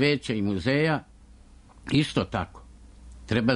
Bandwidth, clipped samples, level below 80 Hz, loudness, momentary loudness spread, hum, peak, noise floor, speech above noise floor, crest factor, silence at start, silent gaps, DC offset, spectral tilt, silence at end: 10.5 kHz; under 0.1%; -48 dBFS; -26 LUFS; 13 LU; none; -10 dBFS; -51 dBFS; 26 dB; 16 dB; 0 s; none; under 0.1%; -6.5 dB/octave; 0 s